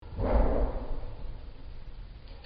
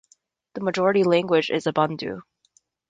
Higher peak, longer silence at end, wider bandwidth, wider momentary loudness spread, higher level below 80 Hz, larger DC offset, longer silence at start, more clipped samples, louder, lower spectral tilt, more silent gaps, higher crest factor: second, -14 dBFS vs -6 dBFS; second, 0 s vs 0.7 s; second, 5.2 kHz vs 9.4 kHz; first, 20 LU vs 15 LU; first, -32 dBFS vs -66 dBFS; neither; second, 0 s vs 0.55 s; neither; second, -32 LUFS vs -22 LUFS; first, -7.5 dB/octave vs -6 dB/octave; neither; about the same, 18 dB vs 18 dB